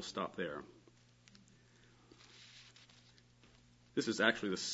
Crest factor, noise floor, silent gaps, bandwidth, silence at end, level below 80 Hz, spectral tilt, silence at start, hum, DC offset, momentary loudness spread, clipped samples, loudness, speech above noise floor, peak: 28 dB; -66 dBFS; none; 7.6 kHz; 0 s; -76 dBFS; -2 dB/octave; 0 s; 60 Hz at -70 dBFS; under 0.1%; 27 LU; under 0.1%; -37 LUFS; 28 dB; -14 dBFS